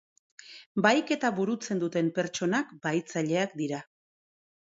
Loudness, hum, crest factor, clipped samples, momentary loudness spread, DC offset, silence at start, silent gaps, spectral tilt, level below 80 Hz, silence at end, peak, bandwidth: -29 LUFS; none; 22 dB; under 0.1%; 11 LU; under 0.1%; 0.45 s; 0.66-0.75 s; -5 dB/octave; -76 dBFS; 0.95 s; -8 dBFS; 8 kHz